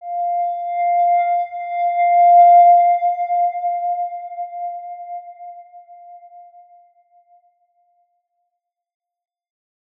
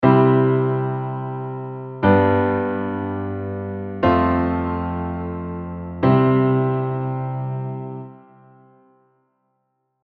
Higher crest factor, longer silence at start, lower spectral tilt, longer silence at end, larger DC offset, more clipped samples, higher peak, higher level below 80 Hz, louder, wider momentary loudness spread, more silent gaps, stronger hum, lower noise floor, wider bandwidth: second, 14 dB vs 20 dB; about the same, 0 s vs 0 s; second, -2.5 dB/octave vs -11 dB/octave; first, 3.6 s vs 1.85 s; neither; neither; about the same, -4 dBFS vs -2 dBFS; second, -84 dBFS vs -46 dBFS; first, -15 LUFS vs -21 LUFS; first, 22 LU vs 14 LU; neither; neither; first, -78 dBFS vs -72 dBFS; second, 3.7 kHz vs 4.6 kHz